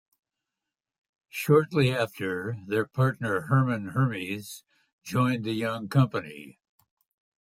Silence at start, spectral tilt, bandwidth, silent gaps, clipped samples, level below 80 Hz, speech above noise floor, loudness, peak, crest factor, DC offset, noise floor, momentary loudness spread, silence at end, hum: 1.35 s; -7 dB/octave; 16 kHz; 4.93-4.99 s; under 0.1%; -66 dBFS; 62 dB; -27 LUFS; -10 dBFS; 18 dB; under 0.1%; -88 dBFS; 16 LU; 0.9 s; none